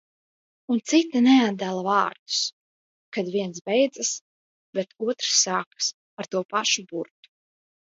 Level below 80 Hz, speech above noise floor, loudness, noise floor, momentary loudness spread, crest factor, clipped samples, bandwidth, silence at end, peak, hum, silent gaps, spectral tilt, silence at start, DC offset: -78 dBFS; over 66 dB; -24 LUFS; under -90 dBFS; 14 LU; 18 dB; under 0.1%; 8 kHz; 0.85 s; -6 dBFS; none; 2.19-2.26 s, 2.53-3.12 s, 3.61-3.65 s, 4.21-4.73 s, 5.67-5.71 s, 5.94-6.17 s, 6.45-6.49 s; -2.5 dB/octave; 0.7 s; under 0.1%